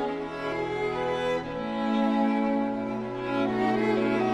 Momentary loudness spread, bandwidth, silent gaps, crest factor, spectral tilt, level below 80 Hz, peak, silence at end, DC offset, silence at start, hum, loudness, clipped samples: 7 LU; 9.6 kHz; none; 14 dB; -6.5 dB/octave; -56 dBFS; -12 dBFS; 0 s; under 0.1%; 0 s; none; -28 LUFS; under 0.1%